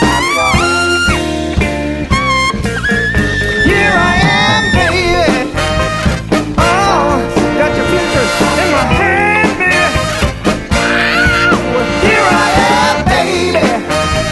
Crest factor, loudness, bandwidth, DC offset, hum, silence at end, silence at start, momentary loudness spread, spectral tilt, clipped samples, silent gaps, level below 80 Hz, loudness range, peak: 12 dB; -11 LUFS; 12 kHz; under 0.1%; none; 0 s; 0 s; 5 LU; -4.5 dB/octave; under 0.1%; none; -24 dBFS; 2 LU; 0 dBFS